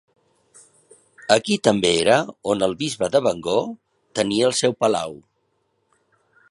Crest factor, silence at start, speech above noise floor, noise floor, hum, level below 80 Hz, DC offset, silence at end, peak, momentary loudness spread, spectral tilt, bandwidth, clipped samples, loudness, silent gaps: 22 dB; 1.25 s; 50 dB; -69 dBFS; none; -58 dBFS; under 0.1%; 1.35 s; 0 dBFS; 13 LU; -4 dB/octave; 11.5 kHz; under 0.1%; -20 LUFS; none